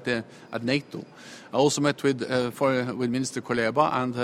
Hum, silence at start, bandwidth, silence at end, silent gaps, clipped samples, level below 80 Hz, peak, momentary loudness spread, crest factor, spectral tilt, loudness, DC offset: none; 0 s; 15.5 kHz; 0 s; none; under 0.1%; -64 dBFS; -8 dBFS; 14 LU; 18 dB; -5 dB/octave; -26 LUFS; under 0.1%